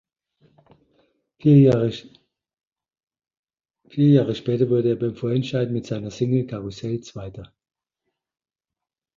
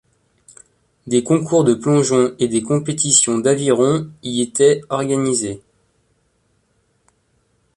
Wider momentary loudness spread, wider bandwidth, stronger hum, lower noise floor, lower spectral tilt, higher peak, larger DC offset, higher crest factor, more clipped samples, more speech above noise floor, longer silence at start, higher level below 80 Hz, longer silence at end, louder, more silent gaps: first, 19 LU vs 8 LU; second, 7.4 kHz vs 11.5 kHz; neither; first, -88 dBFS vs -63 dBFS; first, -8.5 dB/octave vs -4.5 dB/octave; second, -4 dBFS vs 0 dBFS; neither; about the same, 18 dB vs 18 dB; neither; first, 68 dB vs 47 dB; first, 1.45 s vs 1.05 s; about the same, -56 dBFS vs -58 dBFS; second, 1.75 s vs 2.2 s; second, -21 LUFS vs -16 LUFS; first, 2.67-2.71 s, 3.03-3.07 s, 3.39-3.43 s vs none